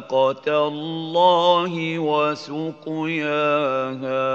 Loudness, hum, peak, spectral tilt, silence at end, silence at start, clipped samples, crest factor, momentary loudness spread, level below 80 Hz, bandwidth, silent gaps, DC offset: -21 LUFS; none; -6 dBFS; -6 dB/octave; 0 s; 0 s; under 0.1%; 16 dB; 11 LU; -76 dBFS; 7.6 kHz; none; under 0.1%